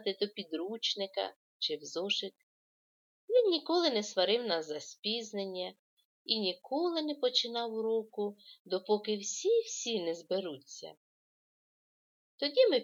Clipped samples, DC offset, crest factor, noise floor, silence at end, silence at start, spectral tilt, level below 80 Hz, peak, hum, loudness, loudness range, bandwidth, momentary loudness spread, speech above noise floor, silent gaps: under 0.1%; under 0.1%; 20 dB; under -90 dBFS; 0 s; 0 s; -2.5 dB/octave; under -90 dBFS; -14 dBFS; none; -33 LUFS; 4 LU; 7.8 kHz; 12 LU; over 57 dB; 1.36-1.60 s, 2.43-3.28 s, 4.99-5.03 s, 5.79-5.97 s, 6.05-6.25 s, 8.59-8.65 s, 10.97-12.38 s